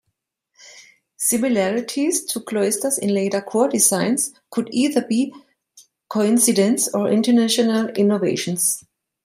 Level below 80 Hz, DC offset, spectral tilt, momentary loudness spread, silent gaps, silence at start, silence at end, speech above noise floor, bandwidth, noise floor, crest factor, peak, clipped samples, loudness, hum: -68 dBFS; under 0.1%; -3.5 dB/octave; 7 LU; none; 0.65 s; 0.45 s; 57 dB; 16 kHz; -76 dBFS; 18 dB; -2 dBFS; under 0.1%; -19 LUFS; none